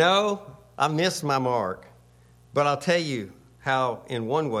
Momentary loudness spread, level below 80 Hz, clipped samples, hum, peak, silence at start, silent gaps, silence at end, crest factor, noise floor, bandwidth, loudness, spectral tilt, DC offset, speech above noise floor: 11 LU; -64 dBFS; under 0.1%; none; -6 dBFS; 0 s; none; 0 s; 18 dB; -55 dBFS; 15.5 kHz; -26 LUFS; -4.5 dB/octave; under 0.1%; 31 dB